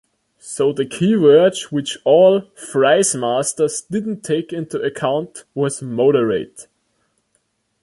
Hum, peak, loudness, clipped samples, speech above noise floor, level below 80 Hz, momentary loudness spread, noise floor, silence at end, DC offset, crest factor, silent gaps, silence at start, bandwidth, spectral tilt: none; -2 dBFS; -17 LUFS; under 0.1%; 50 dB; -62 dBFS; 12 LU; -67 dBFS; 1.2 s; under 0.1%; 16 dB; none; 0.45 s; 11.5 kHz; -4.5 dB/octave